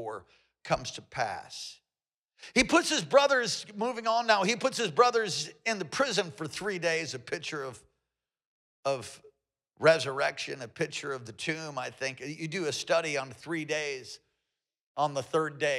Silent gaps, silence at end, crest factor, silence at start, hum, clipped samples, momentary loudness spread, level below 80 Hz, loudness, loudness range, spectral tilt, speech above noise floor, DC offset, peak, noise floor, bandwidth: 2.14-2.28 s, 8.45-8.83 s, 14.81-14.95 s; 0 s; 22 dB; 0 s; none; under 0.1%; 14 LU; -64 dBFS; -30 LUFS; 7 LU; -3 dB/octave; over 60 dB; under 0.1%; -10 dBFS; under -90 dBFS; 14.5 kHz